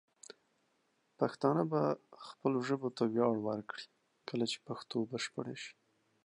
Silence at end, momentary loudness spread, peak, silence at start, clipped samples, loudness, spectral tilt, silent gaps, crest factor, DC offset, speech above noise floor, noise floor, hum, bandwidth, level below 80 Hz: 0.55 s; 20 LU; -16 dBFS; 1.2 s; under 0.1%; -36 LUFS; -6 dB/octave; none; 22 dB; under 0.1%; 42 dB; -77 dBFS; none; 11 kHz; -84 dBFS